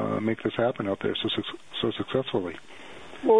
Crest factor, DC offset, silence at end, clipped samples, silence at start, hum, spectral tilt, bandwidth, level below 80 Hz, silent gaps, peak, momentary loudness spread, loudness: 18 dB; 0.3%; 0 s; under 0.1%; 0 s; none; -6.5 dB/octave; 10.5 kHz; -62 dBFS; none; -10 dBFS; 16 LU; -29 LUFS